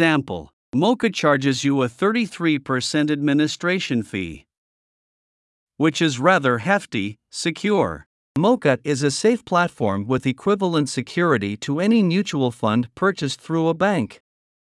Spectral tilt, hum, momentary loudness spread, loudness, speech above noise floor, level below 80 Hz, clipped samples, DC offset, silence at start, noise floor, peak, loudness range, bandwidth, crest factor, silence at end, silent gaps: -5.5 dB/octave; none; 8 LU; -21 LUFS; over 70 dB; -60 dBFS; under 0.1%; under 0.1%; 0 s; under -90 dBFS; -2 dBFS; 3 LU; 12 kHz; 20 dB; 0.5 s; 0.53-0.72 s, 4.58-5.67 s, 8.06-8.35 s